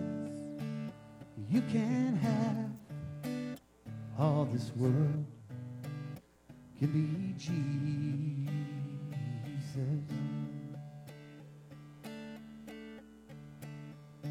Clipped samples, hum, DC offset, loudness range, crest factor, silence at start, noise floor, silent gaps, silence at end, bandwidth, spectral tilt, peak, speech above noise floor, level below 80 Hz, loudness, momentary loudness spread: under 0.1%; none; under 0.1%; 11 LU; 20 dB; 0 s; -57 dBFS; none; 0 s; 14.5 kHz; -8 dB/octave; -16 dBFS; 24 dB; -70 dBFS; -36 LUFS; 20 LU